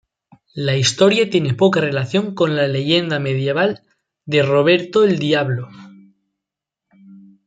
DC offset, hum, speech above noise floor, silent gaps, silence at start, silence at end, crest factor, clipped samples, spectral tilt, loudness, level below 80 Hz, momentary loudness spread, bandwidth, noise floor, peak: under 0.1%; none; 68 dB; none; 0.55 s; 0.25 s; 16 dB; under 0.1%; -5 dB/octave; -17 LUFS; -60 dBFS; 9 LU; 9.4 kHz; -84 dBFS; -2 dBFS